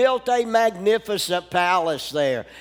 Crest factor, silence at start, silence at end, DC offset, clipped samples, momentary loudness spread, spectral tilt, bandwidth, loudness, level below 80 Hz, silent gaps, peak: 16 dB; 0 s; 0 s; under 0.1%; under 0.1%; 4 LU; -3.5 dB/octave; over 20 kHz; -21 LUFS; -60 dBFS; none; -6 dBFS